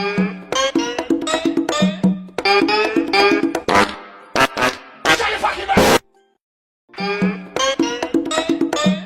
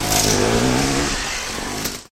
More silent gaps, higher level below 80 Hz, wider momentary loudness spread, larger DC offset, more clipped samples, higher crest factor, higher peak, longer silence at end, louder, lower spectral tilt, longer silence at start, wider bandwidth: first, 6.41-6.88 s vs none; second, -46 dBFS vs -32 dBFS; about the same, 7 LU vs 9 LU; neither; neither; about the same, 16 dB vs 16 dB; about the same, -2 dBFS vs -4 dBFS; about the same, 0 s vs 0.1 s; about the same, -17 LUFS vs -19 LUFS; about the same, -4 dB/octave vs -3 dB/octave; about the same, 0 s vs 0 s; about the same, 17 kHz vs 16.5 kHz